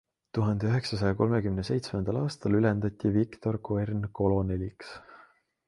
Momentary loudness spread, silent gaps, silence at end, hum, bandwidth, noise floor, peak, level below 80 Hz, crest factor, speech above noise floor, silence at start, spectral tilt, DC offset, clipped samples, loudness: 9 LU; none; 0.5 s; none; 11.5 kHz; -60 dBFS; -10 dBFS; -48 dBFS; 18 dB; 32 dB; 0.35 s; -8 dB/octave; under 0.1%; under 0.1%; -29 LUFS